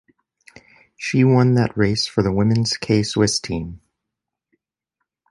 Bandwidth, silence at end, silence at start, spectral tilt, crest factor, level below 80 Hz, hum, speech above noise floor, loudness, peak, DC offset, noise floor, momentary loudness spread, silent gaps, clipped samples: 11.5 kHz; 1.55 s; 1 s; -5.5 dB/octave; 18 dB; -46 dBFS; none; 65 dB; -19 LUFS; -4 dBFS; under 0.1%; -83 dBFS; 12 LU; none; under 0.1%